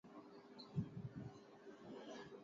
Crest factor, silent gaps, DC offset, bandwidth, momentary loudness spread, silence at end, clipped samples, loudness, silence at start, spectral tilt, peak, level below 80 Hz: 22 dB; none; under 0.1%; 7.4 kHz; 13 LU; 0 s; under 0.1%; -53 LUFS; 0.05 s; -6.5 dB/octave; -32 dBFS; -74 dBFS